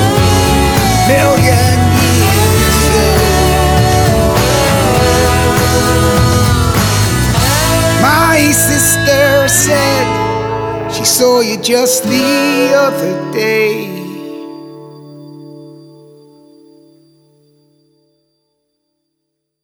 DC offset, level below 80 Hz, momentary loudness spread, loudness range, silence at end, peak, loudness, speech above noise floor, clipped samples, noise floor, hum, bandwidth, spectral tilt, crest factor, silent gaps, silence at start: under 0.1%; -24 dBFS; 8 LU; 7 LU; 3.9 s; 0 dBFS; -10 LUFS; 60 dB; under 0.1%; -72 dBFS; 60 Hz at -40 dBFS; over 20 kHz; -4 dB/octave; 12 dB; none; 0 s